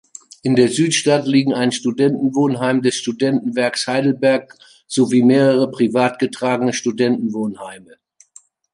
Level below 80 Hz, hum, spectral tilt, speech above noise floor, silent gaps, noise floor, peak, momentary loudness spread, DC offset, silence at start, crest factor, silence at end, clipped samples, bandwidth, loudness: -64 dBFS; none; -5 dB/octave; 33 dB; none; -49 dBFS; -2 dBFS; 8 LU; under 0.1%; 0.45 s; 16 dB; 0.95 s; under 0.1%; 11.5 kHz; -17 LUFS